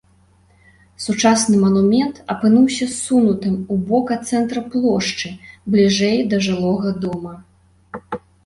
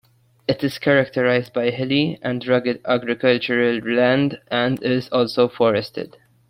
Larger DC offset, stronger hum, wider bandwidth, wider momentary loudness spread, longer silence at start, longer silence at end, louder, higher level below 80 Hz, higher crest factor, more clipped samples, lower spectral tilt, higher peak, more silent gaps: neither; neither; second, 11.5 kHz vs 16 kHz; first, 15 LU vs 6 LU; first, 1 s vs 0.5 s; second, 0.3 s vs 0.45 s; first, -17 LUFS vs -20 LUFS; first, -52 dBFS vs -58 dBFS; about the same, 16 dB vs 18 dB; neither; second, -5 dB/octave vs -7 dB/octave; about the same, -2 dBFS vs -2 dBFS; neither